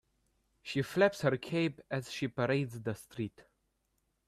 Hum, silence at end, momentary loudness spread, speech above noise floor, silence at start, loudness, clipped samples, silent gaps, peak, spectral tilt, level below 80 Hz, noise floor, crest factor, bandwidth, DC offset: none; 0.85 s; 13 LU; 46 dB; 0.65 s; -34 LUFS; under 0.1%; none; -14 dBFS; -6 dB/octave; -70 dBFS; -79 dBFS; 20 dB; 14.5 kHz; under 0.1%